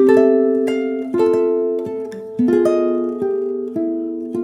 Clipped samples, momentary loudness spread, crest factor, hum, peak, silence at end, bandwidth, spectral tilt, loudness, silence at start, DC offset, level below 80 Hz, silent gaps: under 0.1%; 10 LU; 16 dB; none; -2 dBFS; 0 s; 11 kHz; -7 dB/octave; -18 LUFS; 0 s; under 0.1%; -64 dBFS; none